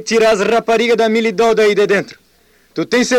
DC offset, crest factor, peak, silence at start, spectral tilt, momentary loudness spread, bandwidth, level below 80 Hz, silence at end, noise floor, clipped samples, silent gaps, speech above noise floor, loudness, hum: under 0.1%; 8 dB; -6 dBFS; 0 s; -4 dB/octave; 9 LU; 15.5 kHz; -52 dBFS; 0 s; -53 dBFS; under 0.1%; none; 40 dB; -13 LUFS; none